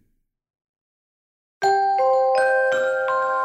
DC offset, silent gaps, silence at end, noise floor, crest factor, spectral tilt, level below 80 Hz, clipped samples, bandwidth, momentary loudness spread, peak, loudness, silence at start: under 0.1%; none; 0 s; -68 dBFS; 14 dB; -2.5 dB/octave; -72 dBFS; under 0.1%; 8.8 kHz; 3 LU; -8 dBFS; -20 LUFS; 1.6 s